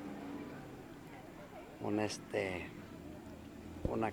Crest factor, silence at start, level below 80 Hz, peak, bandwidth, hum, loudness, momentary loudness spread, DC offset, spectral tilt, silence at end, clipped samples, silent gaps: 22 dB; 0 s; -58 dBFS; -20 dBFS; over 20 kHz; none; -43 LUFS; 14 LU; under 0.1%; -5.5 dB/octave; 0 s; under 0.1%; none